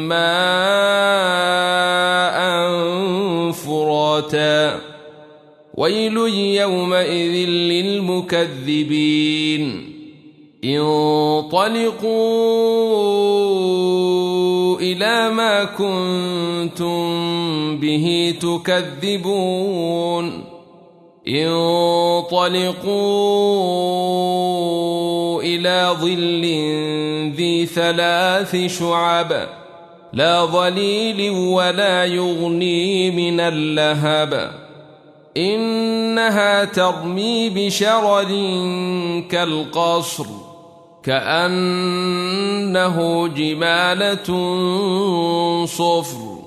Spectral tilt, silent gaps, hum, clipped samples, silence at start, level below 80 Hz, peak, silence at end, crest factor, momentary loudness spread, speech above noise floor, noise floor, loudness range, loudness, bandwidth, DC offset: -4.5 dB/octave; none; none; under 0.1%; 0 s; -64 dBFS; -2 dBFS; 0 s; 16 dB; 6 LU; 29 dB; -47 dBFS; 3 LU; -18 LUFS; 13.5 kHz; under 0.1%